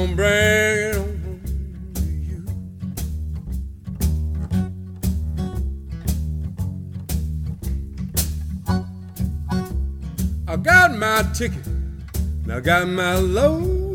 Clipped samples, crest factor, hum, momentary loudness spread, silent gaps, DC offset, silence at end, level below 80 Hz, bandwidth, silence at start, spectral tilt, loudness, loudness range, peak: under 0.1%; 20 dB; none; 14 LU; none; under 0.1%; 0 s; -28 dBFS; 19 kHz; 0 s; -5 dB/octave; -22 LUFS; 8 LU; -2 dBFS